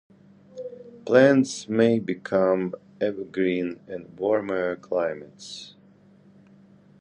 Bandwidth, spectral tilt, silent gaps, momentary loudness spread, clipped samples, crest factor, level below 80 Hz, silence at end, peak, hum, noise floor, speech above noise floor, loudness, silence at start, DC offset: 10.5 kHz; -6 dB/octave; none; 21 LU; under 0.1%; 20 dB; -66 dBFS; 1.3 s; -4 dBFS; none; -54 dBFS; 31 dB; -24 LUFS; 0.55 s; under 0.1%